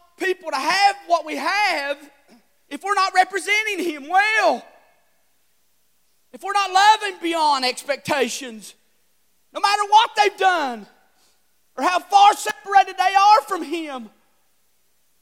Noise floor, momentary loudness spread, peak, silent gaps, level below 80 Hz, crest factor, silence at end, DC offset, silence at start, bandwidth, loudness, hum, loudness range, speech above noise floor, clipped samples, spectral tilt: -67 dBFS; 15 LU; -2 dBFS; none; -76 dBFS; 18 dB; 1.15 s; under 0.1%; 0.2 s; 16.5 kHz; -19 LUFS; none; 3 LU; 48 dB; under 0.1%; -1 dB/octave